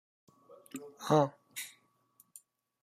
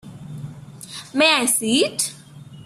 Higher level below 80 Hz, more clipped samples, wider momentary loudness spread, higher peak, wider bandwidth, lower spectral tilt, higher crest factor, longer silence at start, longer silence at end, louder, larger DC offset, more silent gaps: second, -80 dBFS vs -62 dBFS; neither; first, 27 LU vs 22 LU; second, -12 dBFS vs -2 dBFS; about the same, 15.5 kHz vs 15 kHz; first, -5.5 dB/octave vs -2 dB/octave; about the same, 24 dB vs 20 dB; first, 0.75 s vs 0.05 s; first, 1.15 s vs 0.05 s; second, -33 LUFS vs -18 LUFS; neither; neither